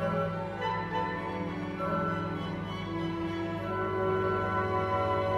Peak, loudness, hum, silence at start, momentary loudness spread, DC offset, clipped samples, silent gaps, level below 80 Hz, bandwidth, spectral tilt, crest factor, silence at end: -18 dBFS; -32 LUFS; none; 0 s; 6 LU; under 0.1%; under 0.1%; none; -54 dBFS; 12.5 kHz; -7.5 dB/octave; 14 dB; 0 s